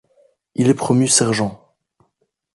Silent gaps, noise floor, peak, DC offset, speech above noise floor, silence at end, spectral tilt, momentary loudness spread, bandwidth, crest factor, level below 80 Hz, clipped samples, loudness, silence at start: none; -69 dBFS; -2 dBFS; under 0.1%; 53 dB; 1 s; -4 dB/octave; 11 LU; 11.5 kHz; 18 dB; -56 dBFS; under 0.1%; -16 LUFS; 0.6 s